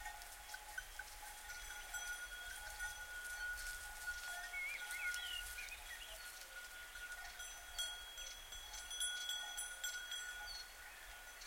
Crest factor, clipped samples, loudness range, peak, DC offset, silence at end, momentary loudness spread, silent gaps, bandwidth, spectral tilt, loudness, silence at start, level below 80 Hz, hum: 22 dB; under 0.1%; 4 LU; -26 dBFS; under 0.1%; 0 s; 9 LU; none; 16.5 kHz; 1.5 dB/octave; -47 LUFS; 0 s; -62 dBFS; none